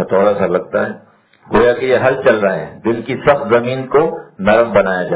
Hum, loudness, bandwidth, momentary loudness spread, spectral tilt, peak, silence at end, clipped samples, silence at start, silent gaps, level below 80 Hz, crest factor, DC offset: none; -14 LUFS; 4 kHz; 7 LU; -10 dB/octave; 0 dBFS; 0 s; 0.1%; 0 s; none; -46 dBFS; 14 dB; under 0.1%